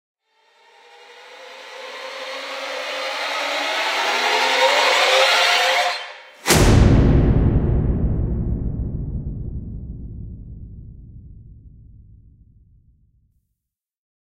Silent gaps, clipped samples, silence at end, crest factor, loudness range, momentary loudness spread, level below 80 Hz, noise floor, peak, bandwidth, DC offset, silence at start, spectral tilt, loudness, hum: none; under 0.1%; 2.65 s; 20 dB; 17 LU; 22 LU; -28 dBFS; -82 dBFS; 0 dBFS; 16 kHz; under 0.1%; 1.1 s; -4.5 dB/octave; -18 LUFS; none